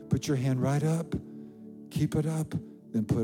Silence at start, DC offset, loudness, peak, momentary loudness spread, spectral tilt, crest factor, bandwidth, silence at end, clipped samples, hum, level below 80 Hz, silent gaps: 0 s; under 0.1%; -30 LUFS; -14 dBFS; 18 LU; -7 dB/octave; 16 dB; 16.5 kHz; 0 s; under 0.1%; none; -56 dBFS; none